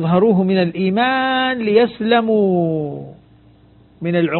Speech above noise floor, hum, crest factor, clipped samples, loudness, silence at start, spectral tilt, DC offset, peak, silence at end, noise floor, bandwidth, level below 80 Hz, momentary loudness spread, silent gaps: 33 dB; none; 16 dB; under 0.1%; -16 LUFS; 0 s; -12 dB/octave; under 0.1%; 0 dBFS; 0 s; -48 dBFS; 4.4 kHz; -54 dBFS; 9 LU; none